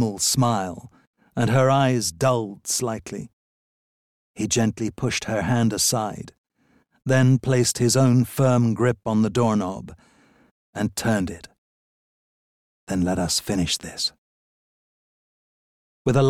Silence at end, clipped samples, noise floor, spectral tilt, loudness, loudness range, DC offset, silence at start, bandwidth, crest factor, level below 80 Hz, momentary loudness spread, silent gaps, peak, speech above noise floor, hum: 0 s; under 0.1%; -64 dBFS; -5 dB/octave; -22 LUFS; 7 LU; under 0.1%; 0 s; 16 kHz; 16 dB; -52 dBFS; 14 LU; 1.07-1.14 s, 3.33-4.34 s, 6.38-6.44 s, 10.51-10.73 s, 11.58-12.87 s, 14.18-16.05 s; -6 dBFS; 42 dB; none